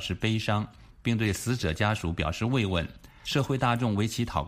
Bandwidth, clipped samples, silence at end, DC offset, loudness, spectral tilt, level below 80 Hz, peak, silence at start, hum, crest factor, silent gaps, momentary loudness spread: 15.5 kHz; under 0.1%; 0 s; under 0.1%; -28 LUFS; -5.5 dB/octave; -44 dBFS; -10 dBFS; 0 s; none; 18 dB; none; 6 LU